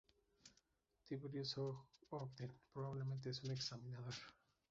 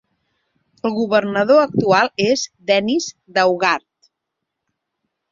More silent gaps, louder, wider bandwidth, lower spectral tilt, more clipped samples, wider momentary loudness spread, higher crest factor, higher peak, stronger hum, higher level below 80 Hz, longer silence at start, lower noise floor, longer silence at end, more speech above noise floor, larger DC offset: neither; second, -49 LUFS vs -17 LUFS; about the same, 7.6 kHz vs 7.6 kHz; about the same, -5.5 dB/octave vs -4.5 dB/octave; neither; first, 18 LU vs 8 LU; about the same, 18 dB vs 18 dB; second, -32 dBFS vs -2 dBFS; neither; second, -80 dBFS vs -62 dBFS; second, 0.45 s vs 0.85 s; about the same, -82 dBFS vs -79 dBFS; second, 0.4 s vs 1.55 s; second, 33 dB vs 63 dB; neither